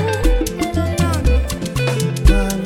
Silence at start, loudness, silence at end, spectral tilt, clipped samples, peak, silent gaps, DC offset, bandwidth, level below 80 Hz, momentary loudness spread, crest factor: 0 s; -18 LUFS; 0 s; -5.5 dB/octave; under 0.1%; 0 dBFS; none; under 0.1%; 16.5 kHz; -18 dBFS; 4 LU; 16 dB